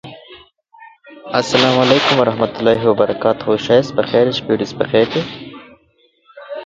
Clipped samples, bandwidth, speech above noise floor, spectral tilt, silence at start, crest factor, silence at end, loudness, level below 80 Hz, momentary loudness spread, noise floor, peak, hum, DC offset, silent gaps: under 0.1%; 7.8 kHz; 42 dB; -5 dB/octave; 0.05 s; 16 dB; 0 s; -15 LUFS; -52 dBFS; 12 LU; -57 dBFS; 0 dBFS; none; under 0.1%; none